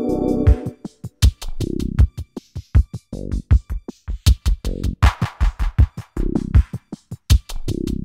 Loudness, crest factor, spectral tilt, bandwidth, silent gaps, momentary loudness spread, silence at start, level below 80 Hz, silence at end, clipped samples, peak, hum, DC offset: -21 LUFS; 18 dB; -6.5 dB/octave; 15.5 kHz; none; 15 LU; 0 s; -20 dBFS; 0 s; under 0.1%; -2 dBFS; none; 0.2%